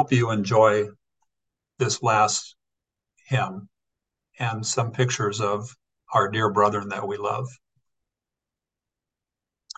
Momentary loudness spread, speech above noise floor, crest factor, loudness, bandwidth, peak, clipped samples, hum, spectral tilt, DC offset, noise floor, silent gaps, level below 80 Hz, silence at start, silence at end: 11 LU; 65 dB; 20 dB; -24 LUFS; 9.2 kHz; -6 dBFS; under 0.1%; none; -4.5 dB/octave; under 0.1%; -88 dBFS; none; -66 dBFS; 0 s; 2.25 s